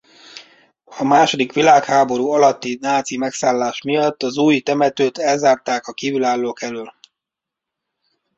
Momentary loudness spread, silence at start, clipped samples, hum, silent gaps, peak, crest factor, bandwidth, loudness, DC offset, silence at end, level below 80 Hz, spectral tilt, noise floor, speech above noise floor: 11 LU; 0.35 s; under 0.1%; none; none; -2 dBFS; 16 dB; 8 kHz; -17 LUFS; under 0.1%; 1.45 s; -64 dBFS; -4 dB/octave; -84 dBFS; 68 dB